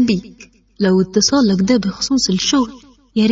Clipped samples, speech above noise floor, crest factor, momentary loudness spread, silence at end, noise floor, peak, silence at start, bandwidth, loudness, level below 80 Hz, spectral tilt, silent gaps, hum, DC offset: under 0.1%; 29 dB; 14 dB; 8 LU; 0 s; -44 dBFS; -2 dBFS; 0 s; 7.8 kHz; -16 LUFS; -46 dBFS; -4.5 dB/octave; none; none; under 0.1%